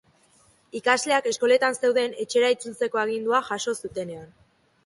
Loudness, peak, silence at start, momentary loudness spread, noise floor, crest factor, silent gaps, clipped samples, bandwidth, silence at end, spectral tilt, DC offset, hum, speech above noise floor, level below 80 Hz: -24 LUFS; -8 dBFS; 0.75 s; 13 LU; -60 dBFS; 18 dB; none; under 0.1%; 11.5 kHz; 0.6 s; -2.5 dB/octave; under 0.1%; none; 36 dB; -68 dBFS